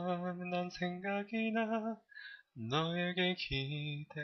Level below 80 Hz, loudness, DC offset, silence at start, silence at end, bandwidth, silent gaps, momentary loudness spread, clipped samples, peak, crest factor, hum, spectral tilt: -62 dBFS; -37 LUFS; under 0.1%; 0 s; 0 s; 6.4 kHz; none; 13 LU; under 0.1%; -20 dBFS; 18 dB; none; -4 dB/octave